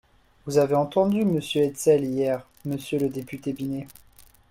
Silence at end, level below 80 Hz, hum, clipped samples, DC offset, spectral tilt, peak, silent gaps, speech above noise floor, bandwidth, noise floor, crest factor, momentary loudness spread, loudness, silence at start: 0.6 s; -60 dBFS; none; under 0.1%; under 0.1%; -6 dB/octave; -8 dBFS; none; 30 dB; 16.5 kHz; -54 dBFS; 16 dB; 11 LU; -25 LUFS; 0.45 s